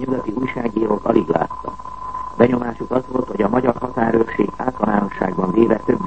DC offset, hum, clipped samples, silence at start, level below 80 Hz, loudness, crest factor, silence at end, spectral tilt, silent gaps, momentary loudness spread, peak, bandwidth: 1%; none; under 0.1%; 0 s; -44 dBFS; -19 LUFS; 18 dB; 0 s; -8.5 dB/octave; none; 10 LU; 0 dBFS; 8.4 kHz